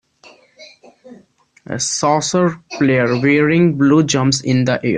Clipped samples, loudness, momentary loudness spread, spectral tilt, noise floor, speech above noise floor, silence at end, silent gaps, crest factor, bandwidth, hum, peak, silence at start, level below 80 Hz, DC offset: under 0.1%; -15 LUFS; 7 LU; -5 dB/octave; -50 dBFS; 36 dB; 0 s; none; 14 dB; 10 kHz; none; -2 dBFS; 0.6 s; -54 dBFS; under 0.1%